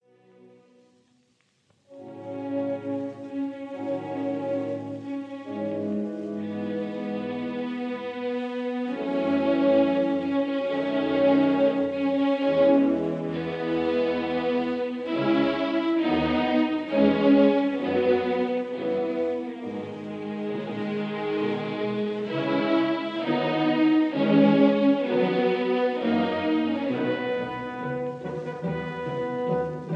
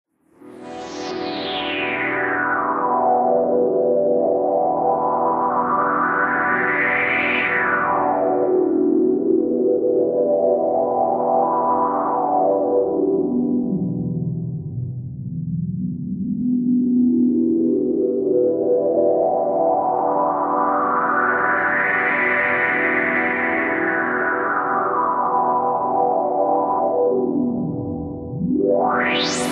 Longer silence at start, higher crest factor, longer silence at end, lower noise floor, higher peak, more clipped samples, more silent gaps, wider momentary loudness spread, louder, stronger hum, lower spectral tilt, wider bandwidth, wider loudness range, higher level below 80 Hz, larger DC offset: first, 1.9 s vs 0.45 s; about the same, 18 dB vs 14 dB; about the same, 0 s vs 0 s; first, -67 dBFS vs -45 dBFS; about the same, -8 dBFS vs -6 dBFS; neither; neither; first, 12 LU vs 8 LU; second, -25 LUFS vs -19 LUFS; neither; first, -8 dB/octave vs -6 dB/octave; second, 6.6 kHz vs 11.5 kHz; first, 9 LU vs 3 LU; second, -60 dBFS vs -54 dBFS; neither